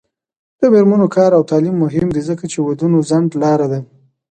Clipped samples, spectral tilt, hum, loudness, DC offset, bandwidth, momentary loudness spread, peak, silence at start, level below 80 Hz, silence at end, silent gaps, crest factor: under 0.1%; -8 dB/octave; none; -14 LUFS; under 0.1%; 9.2 kHz; 9 LU; 0 dBFS; 0.6 s; -50 dBFS; 0.45 s; none; 14 dB